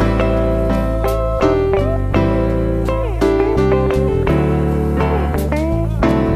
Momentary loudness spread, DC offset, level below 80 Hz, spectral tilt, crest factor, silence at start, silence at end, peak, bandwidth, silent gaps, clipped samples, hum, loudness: 3 LU; under 0.1%; -22 dBFS; -8 dB/octave; 14 dB; 0 s; 0 s; 0 dBFS; 15 kHz; none; under 0.1%; none; -16 LUFS